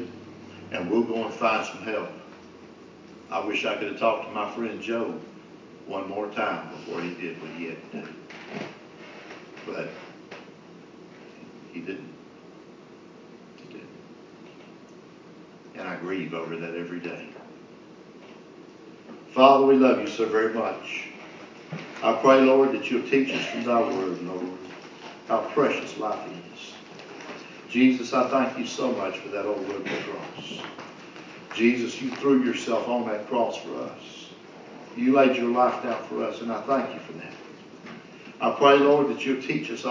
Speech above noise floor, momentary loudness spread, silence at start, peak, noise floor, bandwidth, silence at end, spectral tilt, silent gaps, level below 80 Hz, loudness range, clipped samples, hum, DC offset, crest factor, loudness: 23 dB; 25 LU; 0 s; -2 dBFS; -48 dBFS; 7.6 kHz; 0 s; -5 dB/octave; none; -74 dBFS; 18 LU; under 0.1%; none; under 0.1%; 26 dB; -25 LUFS